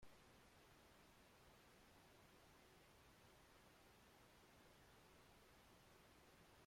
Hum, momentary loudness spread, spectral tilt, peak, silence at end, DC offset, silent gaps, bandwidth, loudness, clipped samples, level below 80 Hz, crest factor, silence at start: none; 0 LU; -3.5 dB/octave; -52 dBFS; 0 s; under 0.1%; none; 16 kHz; -70 LUFS; under 0.1%; -80 dBFS; 18 dB; 0 s